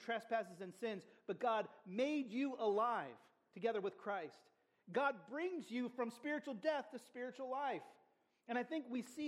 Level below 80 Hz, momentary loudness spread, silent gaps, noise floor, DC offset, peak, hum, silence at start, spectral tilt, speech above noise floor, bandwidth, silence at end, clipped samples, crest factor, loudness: under -90 dBFS; 10 LU; none; -77 dBFS; under 0.1%; -26 dBFS; none; 0 s; -5.5 dB/octave; 34 dB; 14 kHz; 0 s; under 0.1%; 18 dB; -43 LUFS